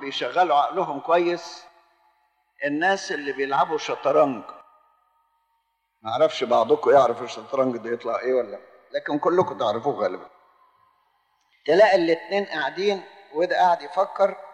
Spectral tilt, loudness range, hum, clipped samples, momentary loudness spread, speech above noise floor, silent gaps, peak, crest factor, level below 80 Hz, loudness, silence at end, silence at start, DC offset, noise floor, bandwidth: -4.5 dB/octave; 4 LU; none; under 0.1%; 14 LU; 51 dB; none; -6 dBFS; 18 dB; -76 dBFS; -23 LUFS; 0 s; 0 s; under 0.1%; -73 dBFS; 9.4 kHz